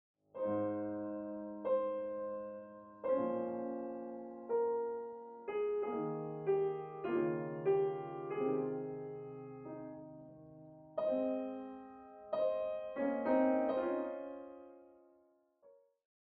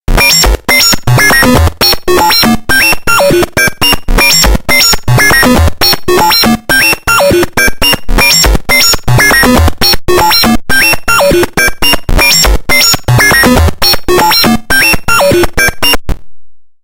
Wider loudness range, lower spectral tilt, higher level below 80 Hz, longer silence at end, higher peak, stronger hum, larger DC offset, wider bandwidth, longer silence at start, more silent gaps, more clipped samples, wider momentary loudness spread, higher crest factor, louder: first, 4 LU vs 1 LU; first, -7 dB/octave vs -3 dB/octave; second, -78 dBFS vs -16 dBFS; first, 0.6 s vs 0.25 s; second, -22 dBFS vs 0 dBFS; neither; neither; second, 4.6 kHz vs over 20 kHz; first, 0.35 s vs 0.1 s; neither; second, under 0.1% vs 2%; first, 17 LU vs 4 LU; first, 16 dB vs 6 dB; second, -38 LUFS vs -6 LUFS